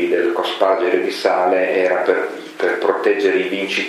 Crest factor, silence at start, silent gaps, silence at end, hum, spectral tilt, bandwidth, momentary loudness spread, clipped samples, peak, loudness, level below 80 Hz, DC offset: 16 dB; 0 s; none; 0 s; none; -4 dB/octave; 13.5 kHz; 4 LU; under 0.1%; 0 dBFS; -17 LUFS; -72 dBFS; under 0.1%